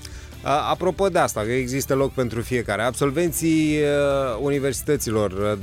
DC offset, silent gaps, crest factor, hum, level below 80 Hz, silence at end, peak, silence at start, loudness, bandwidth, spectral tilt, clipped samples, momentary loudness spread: under 0.1%; none; 16 dB; none; -42 dBFS; 0 s; -6 dBFS; 0 s; -22 LUFS; 16.5 kHz; -5 dB/octave; under 0.1%; 4 LU